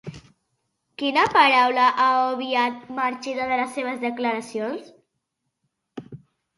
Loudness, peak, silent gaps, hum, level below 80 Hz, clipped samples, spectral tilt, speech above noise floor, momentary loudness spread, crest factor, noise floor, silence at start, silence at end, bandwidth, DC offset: -21 LUFS; -4 dBFS; none; none; -66 dBFS; under 0.1%; -4 dB/octave; 57 dB; 22 LU; 20 dB; -78 dBFS; 0.05 s; 0.4 s; 11.5 kHz; under 0.1%